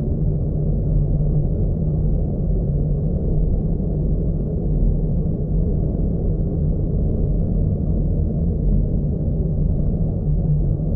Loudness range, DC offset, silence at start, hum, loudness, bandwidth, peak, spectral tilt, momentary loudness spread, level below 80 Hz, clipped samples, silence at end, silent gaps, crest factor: 1 LU; under 0.1%; 0 s; none; -22 LUFS; 1.4 kHz; -6 dBFS; -15 dB/octave; 2 LU; -22 dBFS; under 0.1%; 0 s; none; 12 dB